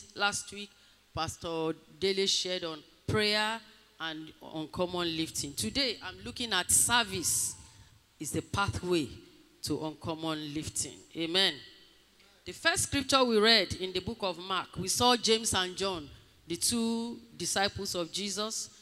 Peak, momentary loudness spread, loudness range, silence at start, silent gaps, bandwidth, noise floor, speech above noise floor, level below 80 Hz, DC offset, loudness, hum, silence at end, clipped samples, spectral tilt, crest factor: -10 dBFS; 16 LU; 6 LU; 0 s; none; 16 kHz; -62 dBFS; 31 dB; -60 dBFS; under 0.1%; -30 LUFS; none; 0.15 s; under 0.1%; -2.5 dB/octave; 22 dB